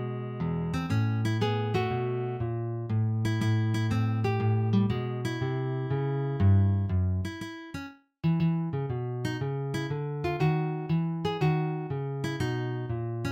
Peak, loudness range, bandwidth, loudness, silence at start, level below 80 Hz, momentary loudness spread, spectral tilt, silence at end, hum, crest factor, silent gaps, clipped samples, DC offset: -14 dBFS; 3 LU; 9.6 kHz; -29 LUFS; 0 s; -54 dBFS; 7 LU; -8 dB/octave; 0 s; none; 14 dB; none; under 0.1%; under 0.1%